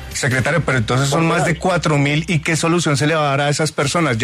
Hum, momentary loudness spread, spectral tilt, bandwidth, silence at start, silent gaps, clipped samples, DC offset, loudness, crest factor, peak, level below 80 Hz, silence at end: none; 2 LU; -5 dB/octave; 13.5 kHz; 0 s; none; under 0.1%; under 0.1%; -17 LUFS; 12 dB; -4 dBFS; -40 dBFS; 0 s